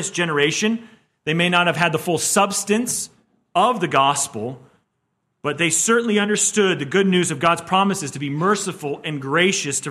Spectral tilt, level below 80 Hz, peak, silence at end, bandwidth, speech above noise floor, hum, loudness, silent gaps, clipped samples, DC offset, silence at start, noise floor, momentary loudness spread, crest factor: -3.5 dB/octave; -64 dBFS; -2 dBFS; 0 s; 15.5 kHz; 53 dB; none; -19 LUFS; none; under 0.1%; under 0.1%; 0 s; -72 dBFS; 10 LU; 18 dB